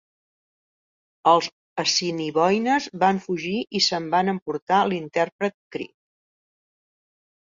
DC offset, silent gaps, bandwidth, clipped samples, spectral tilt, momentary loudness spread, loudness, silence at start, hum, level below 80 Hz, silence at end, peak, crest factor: under 0.1%; 1.52-1.76 s, 4.42-4.46 s, 4.62-4.67 s, 5.32-5.39 s, 5.54-5.71 s; 7.6 kHz; under 0.1%; -4 dB/octave; 10 LU; -22 LUFS; 1.25 s; none; -68 dBFS; 1.6 s; -4 dBFS; 22 dB